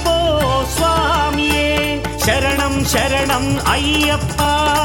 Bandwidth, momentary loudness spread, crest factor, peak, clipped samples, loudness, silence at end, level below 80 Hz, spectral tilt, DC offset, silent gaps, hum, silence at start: 17 kHz; 2 LU; 14 dB; -2 dBFS; under 0.1%; -16 LUFS; 0 s; -26 dBFS; -4 dB/octave; under 0.1%; none; none; 0 s